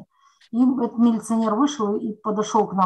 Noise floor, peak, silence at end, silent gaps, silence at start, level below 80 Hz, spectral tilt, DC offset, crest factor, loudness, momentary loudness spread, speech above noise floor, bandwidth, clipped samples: -52 dBFS; -6 dBFS; 0 s; none; 0 s; -68 dBFS; -6 dB/octave; under 0.1%; 14 dB; -22 LUFS; 6 LU; 32 dB; 12 kHz; under 0.1%